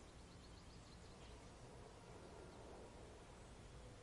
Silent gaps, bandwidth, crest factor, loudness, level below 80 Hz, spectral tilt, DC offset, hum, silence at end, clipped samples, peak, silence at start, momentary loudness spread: none; 11.5 kHz; 14 dB; -60 LUFS; -64 dBFS; -5 dB/octave; under 0.1%; none; 0 s; under 0.1%; -46 dBFS; 0 s; 2 LU